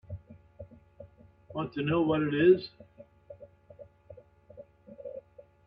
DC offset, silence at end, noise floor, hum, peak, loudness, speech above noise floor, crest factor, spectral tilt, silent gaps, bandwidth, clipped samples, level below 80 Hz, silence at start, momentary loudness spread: under 0.1%; 0.45 s; -54 dBFS; none; -12 dBFS; -27 LUFS; 28 dB; 22 dB; -10 dB/octave; none; 5.2 kHz; under 0.1%; -64 dBFS; 0.1 s; 28 LU